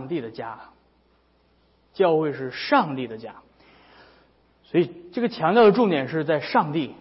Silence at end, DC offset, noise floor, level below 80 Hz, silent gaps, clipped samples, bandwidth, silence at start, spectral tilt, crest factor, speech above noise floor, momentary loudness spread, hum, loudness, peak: 0.05 s; under 0.1%; -62 dBFS; -66 dBFS; none; under 0.1%; 5.8 kHz; 0 s; -10 dB/octave; 18 dB; 40 dB; 20 LU; none; -22 LUFS; -6 dBFS